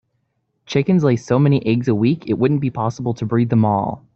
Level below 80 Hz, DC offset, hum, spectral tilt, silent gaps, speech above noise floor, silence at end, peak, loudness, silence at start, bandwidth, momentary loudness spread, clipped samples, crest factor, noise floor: -54 dBFS; under 0.1%; none; -8 dB/octave; none; 52 dB; 0.2 s; -2 dBFS; -18 LUFS; 0.7 s; 7.2 kHz; 6 LU; under 0.1%; 14 dB; -69 dBFS